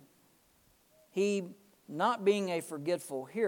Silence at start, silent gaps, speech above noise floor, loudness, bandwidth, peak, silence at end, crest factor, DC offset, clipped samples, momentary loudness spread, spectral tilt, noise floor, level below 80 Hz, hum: 1.15 s; none; 36 dB; -33 LUFS; 18 kHz; -16 dBFS; 0 s; 18 dB; under 0.1%; under 0.1%; 11 LU; -5 dB/octave; -68 dBFS; -84 dBFS; none